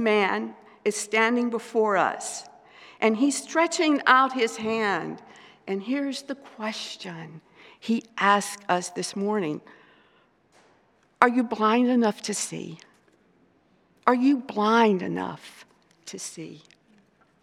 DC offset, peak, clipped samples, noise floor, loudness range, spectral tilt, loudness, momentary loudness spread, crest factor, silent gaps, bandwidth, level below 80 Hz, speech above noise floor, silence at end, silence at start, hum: under 0.1%; 0 dBFS; under 0.1%; -63 dBFS; 5 LU; -4 dB/octave; -24 LUFS; 17 LU; 26 dB; none; 14.5 kHz; -80 dBFS; 38 dB; 0.85 s; 0 s; none